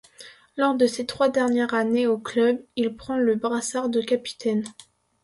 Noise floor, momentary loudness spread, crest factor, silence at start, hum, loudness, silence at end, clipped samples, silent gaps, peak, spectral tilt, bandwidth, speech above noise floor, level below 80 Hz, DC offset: -48 dBFS; 6 LU; 16 dB; 0.2 s; none; -24 LUFS; 0.5 s; under 0.1%; none; -8 dBFS; -4 dB/octave; 11.5 kHz; 25 dB; -64 dBFS; under 0.1%